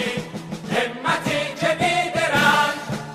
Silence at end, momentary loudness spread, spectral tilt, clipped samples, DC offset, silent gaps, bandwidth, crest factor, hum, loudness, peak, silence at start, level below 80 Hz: 0 s; 12 LU; -4 dB/octave; under 0.1%; under 0.1%; none; 15.5 kHz; 18 dB; none; -21 LUFS; -4 dBFS; 0 s; -54 dBFS